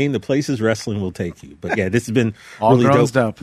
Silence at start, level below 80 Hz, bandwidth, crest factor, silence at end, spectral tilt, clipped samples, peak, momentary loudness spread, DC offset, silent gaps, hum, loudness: 0 s; -52 dBFS; 14 kHz; 14 dB; 0.1 s; -6.5 dB/octave; under 0.1%; -4 dBFS; 12 LU; under 0.1%; none; none; -18 LUFS